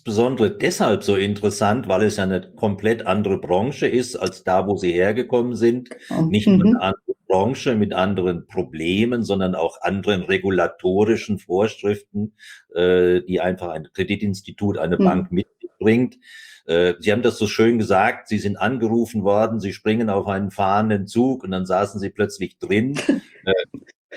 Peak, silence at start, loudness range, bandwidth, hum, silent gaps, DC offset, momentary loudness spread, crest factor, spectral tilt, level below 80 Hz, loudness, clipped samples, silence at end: -6 dBFS; 0.05 s; 2 LU; 15.5 kHz; none; 23.95-24.09 s; under 0.1%; 7 LU; 14 dB; -6 dB/octave; -56 dBFS; -20 LUFS; under 0.1%; 0 s